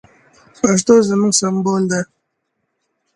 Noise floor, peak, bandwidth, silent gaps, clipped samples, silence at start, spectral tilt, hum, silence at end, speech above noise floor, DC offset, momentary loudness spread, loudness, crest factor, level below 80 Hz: -72 dBFS; 0 dBFS; 11.5 kHz; none; under 0.1%; 0.65 s; -4.5 dB/octave; none; 1.1 s; 57 dB; under 0.1%; 9 LU; -15 LUFS; 18 dB; -56 dBFS